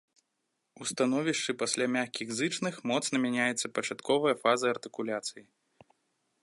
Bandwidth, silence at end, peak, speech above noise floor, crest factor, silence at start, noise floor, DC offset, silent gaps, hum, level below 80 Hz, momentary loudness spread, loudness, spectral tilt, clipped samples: 11.5 kHz; 1 s; -10 dBFS; 51 dB; 22 dB; 0.8 s; -81 dBFS; under 0.1%; none; none; -80 dBFS; 8 LU; -30 LUFS; -3 dB/octave; under 0.1%